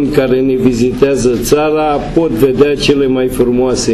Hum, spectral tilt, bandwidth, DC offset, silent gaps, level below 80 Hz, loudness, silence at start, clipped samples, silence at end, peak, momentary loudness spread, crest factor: none; -5.5 dB/octave; 14 kHz; under 0.1%; none; -30 dBFS; -11 LUFS; 0 s; 0.2%; 0 s; 0 dBFS; 3 LU; 10 dB